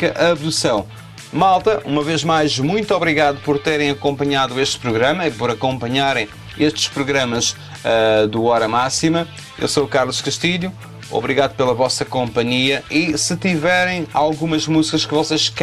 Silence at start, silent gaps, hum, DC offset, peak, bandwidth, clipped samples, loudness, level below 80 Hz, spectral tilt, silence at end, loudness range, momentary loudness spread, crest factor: 0 s; none; none; under 0.1%; -2 dBFS; 14.5 kHz; under 0.1%; -17 LUFS; -46 dBFS; -4 dB/octave; 0 s; 2 LU; 5 LU; 16 dB